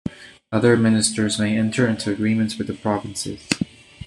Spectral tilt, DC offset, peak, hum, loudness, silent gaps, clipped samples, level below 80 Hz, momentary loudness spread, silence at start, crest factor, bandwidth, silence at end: -5 dB/octave; under 0.1%; -2 dBFS; none; -21 LUFS; none; under 0.1%; -52 dBFS; 11 LU; 0.05 s; 20 dB; 12.5 kHz; 0 s